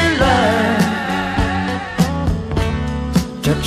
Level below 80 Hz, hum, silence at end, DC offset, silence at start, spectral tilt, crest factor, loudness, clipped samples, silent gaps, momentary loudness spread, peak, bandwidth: -28 dBFS; none; 0 s; under 0.1%; 0 s; -5.5 dB/octave; 16 dB; -17 LUFS; under 0.1%; none; 7 LU; -2 dBFS; 15.5 kHz